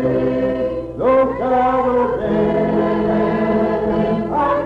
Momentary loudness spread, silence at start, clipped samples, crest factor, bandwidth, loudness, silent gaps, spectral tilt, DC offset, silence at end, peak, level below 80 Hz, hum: 3 LU; 0 s; under 0.1%; 10 dB; 5.8 kHz; -17 LUFS; none; -9 dB/octave; under 0.1%; 0 s; -6 dBFS; -38 dBFS; none